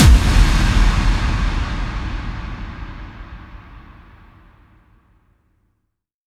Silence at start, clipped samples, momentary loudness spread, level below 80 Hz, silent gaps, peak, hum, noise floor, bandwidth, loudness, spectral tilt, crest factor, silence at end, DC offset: 0 s; under 0.1%; 23 LU; -20 dBFS; none; 0 dBFS; none; -71 dBFS; 13.5 kHz; -19 LUFS; -5 dB/octave; 18 dB; 2.45 s; under 0.1%